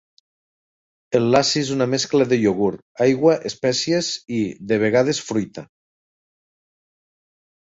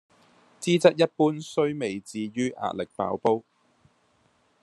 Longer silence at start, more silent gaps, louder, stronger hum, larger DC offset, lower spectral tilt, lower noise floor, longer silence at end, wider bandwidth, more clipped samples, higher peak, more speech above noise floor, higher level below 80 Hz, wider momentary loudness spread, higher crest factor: first, 1.1 s vs 0.6 s; first, 2.82-2.95 s vs none; first, -20 LUFS vs -26 LUFS; neither; neither; about the same, -4.5 dB/octave vs -5.5 dB/octave; first, under -90 dBFS vs -66 dBFS; first, 2.1 s vs 1.25 s; second, 8 kHz vs 12 kHz; neither; about the same, -2 dBFS vs -4 dBFS; first, over 71 dB vs 41 dB; first, -60 dBFS vs -72 dBFS; second, 8 LU vs 11 LU; second, 18 dB vs 24 dB